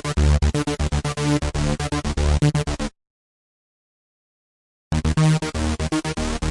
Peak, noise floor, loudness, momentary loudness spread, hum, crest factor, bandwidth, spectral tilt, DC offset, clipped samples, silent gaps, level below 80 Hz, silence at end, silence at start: -8 dBFS; under -90 dBFS; -22 LUFS; 7 LU; none; 14 dB; 11.5 kHz; -5.5 dB/octave; under 0.1%; under 0.1%; 3.10-4.91 s; -28 dBFS; 0 s; 0.05 s